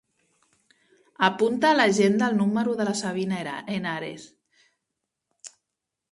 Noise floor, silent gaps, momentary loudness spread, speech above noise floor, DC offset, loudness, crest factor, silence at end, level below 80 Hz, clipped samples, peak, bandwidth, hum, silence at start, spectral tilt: -85 dBFS; none; 25 LU; 61 dB; under 0.1%; -24 LUFS; 22 dB; 0.65 s; -70 dBFS; under 0.1%; -4 dBFS; 11.5 kHz; none; 1.2 s; -5 dB/octave